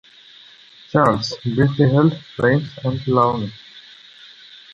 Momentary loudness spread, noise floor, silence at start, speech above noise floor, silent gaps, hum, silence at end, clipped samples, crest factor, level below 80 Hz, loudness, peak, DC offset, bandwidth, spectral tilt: 15 LU; -46 dBFS; 0.95 s; 28 dB; none; none; 0.95 s; under 0.1%; 18 dB; -50 dBFS; -18 LUFS; -2 dBFS; under 0.1%; 8.2 kHz; -7.5 dB/octave